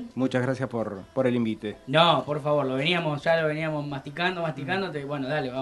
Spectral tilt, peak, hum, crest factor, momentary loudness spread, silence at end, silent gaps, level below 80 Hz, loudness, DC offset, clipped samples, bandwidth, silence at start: -6.5 dB/octave; -6 dBFS; none; 20 dB; 10 LU; 0 s; none; -62 dBFS; -26 LUFS; under 0.1%; under 0.1%; 12 kHz; 0 s